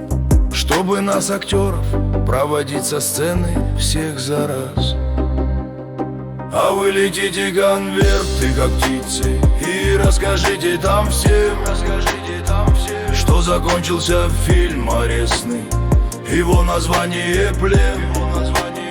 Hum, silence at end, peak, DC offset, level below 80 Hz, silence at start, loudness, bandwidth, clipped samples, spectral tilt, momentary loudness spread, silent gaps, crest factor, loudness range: none; 0 s; -2 dBFS; under 0.1%; -20 dBFS; 0 s; -17 LUFS; 19 kHz; under 0.1%; -5 dB/octave; 5 LU; none; 14 dB; 3 LU